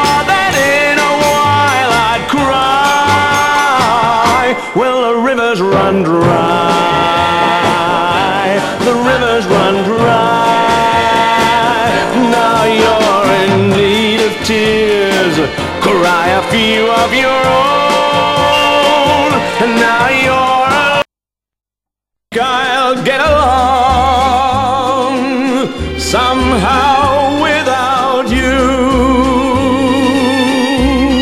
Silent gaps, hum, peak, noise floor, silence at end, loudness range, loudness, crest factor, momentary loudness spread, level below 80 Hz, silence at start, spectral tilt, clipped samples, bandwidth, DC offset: none; none; 0 dBFS; -87 dBFS; 0 s; 2 LU; -10 LUFS; 10 dB; 3 LU; -30 dBFS; 0 s; -4.5 dB/octave; under 0.1%; 16 kHz; under 0.1%